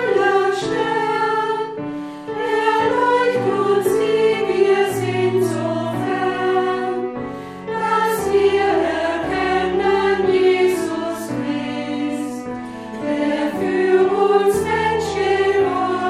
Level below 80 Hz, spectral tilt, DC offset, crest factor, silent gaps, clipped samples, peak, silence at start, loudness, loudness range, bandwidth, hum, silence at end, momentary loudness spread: -50 dBFS; -5.5 dB/octave; under 0.1%; 14 dB; none; under 0.1%; -4 dBFS; 0 s; -19 LUFS; 3 LU; 14.5 kHz; none; 0 s; 10 LU